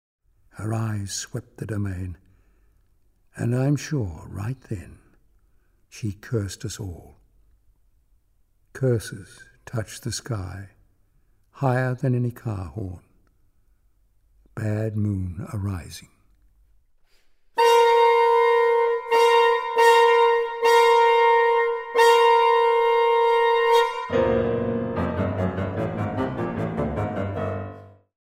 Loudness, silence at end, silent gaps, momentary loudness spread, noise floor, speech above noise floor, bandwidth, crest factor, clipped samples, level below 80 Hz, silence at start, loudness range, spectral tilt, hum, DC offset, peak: -21 LUFS; 0.45 s; none; 17 LU; -63 dBFS; 35 dB; 15.5 kHz; 18 dB; under 0.1%; -50 dBFS; 0.55 s; 15 LU; -5.5 dB/octave; none; under 0.1%; -4 dBFS